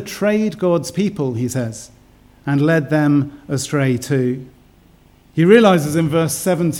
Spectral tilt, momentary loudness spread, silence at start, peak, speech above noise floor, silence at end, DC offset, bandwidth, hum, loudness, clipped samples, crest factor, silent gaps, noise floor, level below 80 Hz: -6 dB/octave; 12 LU; 0 s; 0 dBFS; 33 dB; 0 s; under 0.1%; 17.5 kHz; none; -17 LUFS; under 0.1%; 18 dB; none; -50 dBFS; -52 dBFS